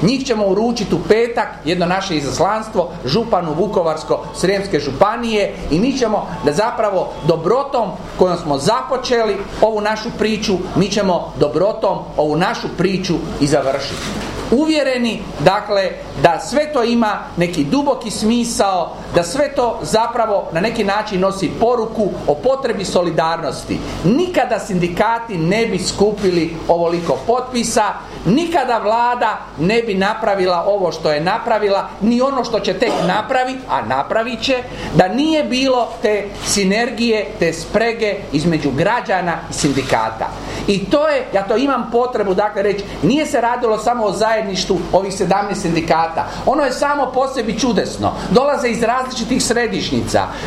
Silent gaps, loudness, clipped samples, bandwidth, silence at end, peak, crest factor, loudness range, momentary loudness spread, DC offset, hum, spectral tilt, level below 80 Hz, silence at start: none; -17 LUFS; under 0.1%; 15 kHz; 0 s; 0 dBFS; 16 dB; 1 LU; 4 LU; under 0.1%; none; -5 dB/octave; -40 dBFS; 0 s